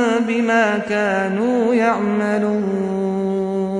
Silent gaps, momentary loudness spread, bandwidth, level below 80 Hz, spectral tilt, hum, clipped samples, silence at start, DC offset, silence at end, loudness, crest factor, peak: none; 5 LU; 10.5 kHz; -56 dBFS; -6.5 dB/octave; none; under 0.1%; 0 s; under 0.1%; 0 s; -18 LUFS; 12 dB; -6 dBFS